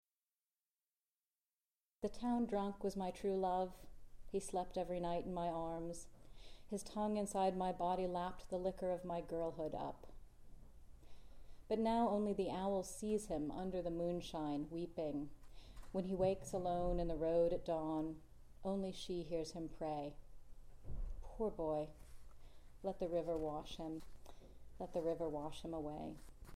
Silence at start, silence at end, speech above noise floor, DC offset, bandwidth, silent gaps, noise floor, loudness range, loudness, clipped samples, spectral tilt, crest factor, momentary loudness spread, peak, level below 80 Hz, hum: 2 s; 0 s; over 49 dB; under 0.1%; 15.5 kHz; none; under -90 dBFS; 6 LU; -42 LUFS; under 0.1%; -6.5 dB/octave; 18 dB; 14 LU; -26 dBFS; -56 dBFS; none